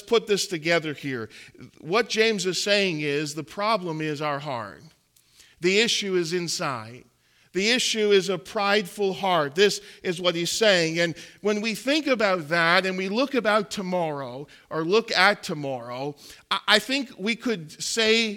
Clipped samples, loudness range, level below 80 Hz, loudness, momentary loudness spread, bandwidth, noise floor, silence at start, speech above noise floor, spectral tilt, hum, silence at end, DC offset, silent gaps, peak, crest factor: under 0.1%; 4 LU; -68 dBFS; -24 LUFS; 12 LU; 17.5 kHz; -58 dBFS; 0.05 s; 34 dB; -3 dB/octave; none; 0 s; under 0.1%; none; -4 dBFS; 22 dB